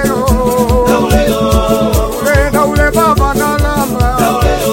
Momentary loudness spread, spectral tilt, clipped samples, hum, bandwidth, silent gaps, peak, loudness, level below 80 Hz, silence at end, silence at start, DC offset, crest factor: 3 LU; -5.5 dB/octave; 0.1%; none; 17 kHz; none; 0 dBFS; -11 LUFS; -18 dBFS; 0 s; 0 s; under 0.1%; 10 dB